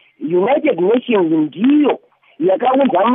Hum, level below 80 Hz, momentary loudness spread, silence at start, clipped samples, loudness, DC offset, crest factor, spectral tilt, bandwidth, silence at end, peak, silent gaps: none; -78 dBFS; 5 LU; 0.2 s; under 0.1%; -15 LUFS; under 0.1%; 10 dB; -11.5 dB/octave; 3.8 kHz; 0 s; -4 dBFS; none